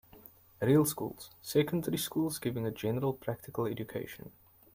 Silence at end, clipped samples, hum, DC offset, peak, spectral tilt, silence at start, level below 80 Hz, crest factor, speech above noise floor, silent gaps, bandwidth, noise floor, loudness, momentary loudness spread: 0.45 s; under 0.1%; none; under 0.1%; -16 dBFS; -5.5 dB/octave; 0.15 s; -66 dBFS; 18 dB; 24 dB; none; 16.5 kHz; -57 dBFS; -33 LUFS; 14 LU